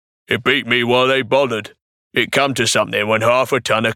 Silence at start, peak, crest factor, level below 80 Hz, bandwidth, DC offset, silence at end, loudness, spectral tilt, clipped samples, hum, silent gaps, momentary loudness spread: 0.3 s; -2 dBFS; 16 dB; -60 dBFS; 18 kHz; under 0.1%; 0 s; -16 LUFS; -3.5 dB/octave; under 0.1%; none; 1.82-2.11 s; 6 LU